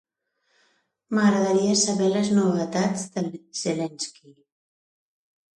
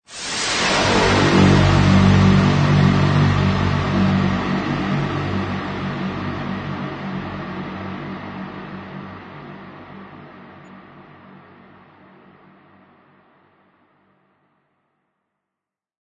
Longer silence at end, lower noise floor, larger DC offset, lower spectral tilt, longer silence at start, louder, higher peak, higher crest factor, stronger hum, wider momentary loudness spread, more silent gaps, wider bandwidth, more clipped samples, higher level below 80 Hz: second, 1.45 s vs 5.05 s; second, -73 dBFS vs -86 dBFS; neither; second, -4.5 dB/octave vs -6 dB/octave; first, 1.1 s vs 0.1 s; second, -23 LUFS vs -18 LUFS; second, -8 dBFS vs -2 dBFS; about the same, 16 dB vs 18 dB; neither; second, 11 LU vs 23 LU; neither; first, 11.5 kHz vs 9.4 kHz; neither; second, -68 dBFS vs -38 dBFS